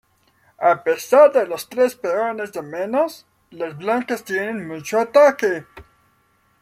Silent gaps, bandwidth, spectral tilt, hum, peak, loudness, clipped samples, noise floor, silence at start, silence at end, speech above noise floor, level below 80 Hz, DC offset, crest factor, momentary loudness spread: none; 15.5 kHz; -4.5 dB/octave; none; -2 dBFS; -19 LUFS; under 0.1%; -61 dBFS; 0.6 s; 0.8 s; 43 dB; -64 dBFS; under 0.1%; 18 dB; 15 LU